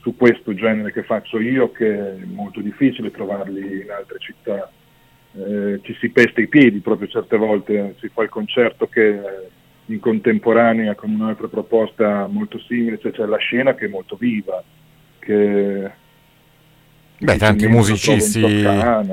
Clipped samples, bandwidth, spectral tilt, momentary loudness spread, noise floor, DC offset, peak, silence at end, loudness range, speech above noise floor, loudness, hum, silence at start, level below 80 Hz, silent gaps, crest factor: under 0.1%; 16 kHz; -5.5 dB/octave; 14 LU; -52 dBFS; under 0.1%; 0 dBFS; 0 s; 6 LU; 35 dB; -18 LUFS; none; 0.05 s; -46 dBFS; none; 18 dB